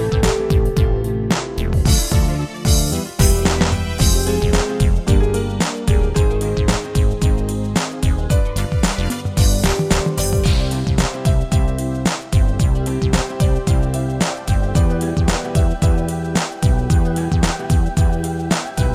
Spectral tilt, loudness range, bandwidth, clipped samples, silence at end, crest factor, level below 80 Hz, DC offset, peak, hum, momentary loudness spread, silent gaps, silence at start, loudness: -5.5 dB/octave; 2 LU; 16 kHz; under 0.1%; 0 s; 16 dB; -20 dBFS; under 0.1%; 0 dBFS; none; 4 LU; none; 0 s; -18 LUFS